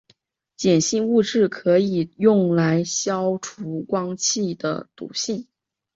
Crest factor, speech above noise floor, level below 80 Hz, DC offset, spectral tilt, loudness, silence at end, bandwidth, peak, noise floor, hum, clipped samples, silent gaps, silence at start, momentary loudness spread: 16 dB; 42 dB; -62 dBFS; under 0.1%; -4.5 dB/octave; -21 LUFS; 0.55 s; 8 kHz; -4 dBFS; -62 dBFS; none; under 0.1%; none; 0.6 s; 11 LU